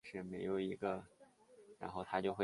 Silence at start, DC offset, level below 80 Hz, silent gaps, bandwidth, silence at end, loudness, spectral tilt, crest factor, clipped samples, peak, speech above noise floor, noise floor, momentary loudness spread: 0.05 s; under 0.1%; -72 dBFS; none; 11.5 kHz; 0 s; -43 LUFS; -7 dB/octave; 22 dB; under 0.1%; -22 dBFS; 24 dB; -65 dBFS; 9 LU